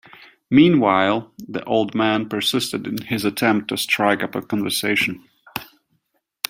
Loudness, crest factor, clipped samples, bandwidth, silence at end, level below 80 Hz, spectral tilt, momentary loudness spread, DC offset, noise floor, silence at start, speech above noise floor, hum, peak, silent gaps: -19 LUFS; 20 dB; under 0.1%; 16.5 kHz; 0.85 s; -60 dBFS; -4.5 dB/octave; 16 LU; under 0.1%; -70 dBFS; 0.5 s; 51 dB; none; 0 dBFS; none